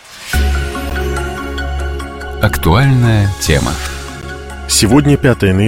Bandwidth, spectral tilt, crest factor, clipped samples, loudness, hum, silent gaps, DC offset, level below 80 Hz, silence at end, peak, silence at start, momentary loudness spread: 17 kHz; -5 dB/octave; 14 dB; under 0.1%; -14 LUFS; none; none; under 0.1%; -22 dBFS; 0 s; 0 dBFS; 0.05 s; 15 LU